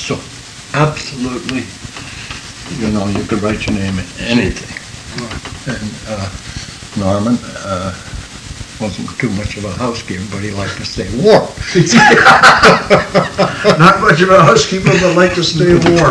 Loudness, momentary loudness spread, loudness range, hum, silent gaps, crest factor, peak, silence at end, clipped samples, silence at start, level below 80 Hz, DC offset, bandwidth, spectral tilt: -11 LUFS; 20 LU; 13 LU; none; none; 12 dB; 0 dBFS; 0 s; 0.7%; 0 s; -34 dBFS; under 0.1%; 11 kHz; -5 dB/octave